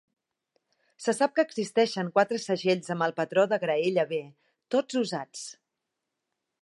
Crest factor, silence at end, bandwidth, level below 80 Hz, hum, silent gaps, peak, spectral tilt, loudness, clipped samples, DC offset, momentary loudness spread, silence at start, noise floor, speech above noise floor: 20 dB; 1.1 s; 11.5 kHz; -82 dBFS; none; none; -8 dBFS; -4.5 dB/octave; -27 LUFS; under 0.1%; under 0.1%; 9 LU; 1 s; -85 dBFS; 58 dB